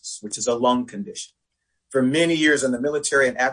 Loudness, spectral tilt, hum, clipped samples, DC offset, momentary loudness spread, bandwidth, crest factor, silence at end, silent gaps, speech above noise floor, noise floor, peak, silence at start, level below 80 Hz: -21 LUFS; -3.5 dB/octave; none; under 0.1%; under 0.1%; 14 LU; 10.5 kHz; 18 dB; 0 s; none; 55 dB; -76 dBFS; -4 dBFS; 0.05 s; -62 dBFS